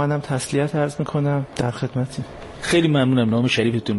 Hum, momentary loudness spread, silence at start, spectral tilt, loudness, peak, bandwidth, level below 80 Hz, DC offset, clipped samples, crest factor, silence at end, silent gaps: none; 10 LU; 0 s; -6 dB/octave; -21 LUFS; -4 dBFS; 11.5 kHz; -50 dBFS; under 0.1%; under 0.1%; 16 dB; 0 s; none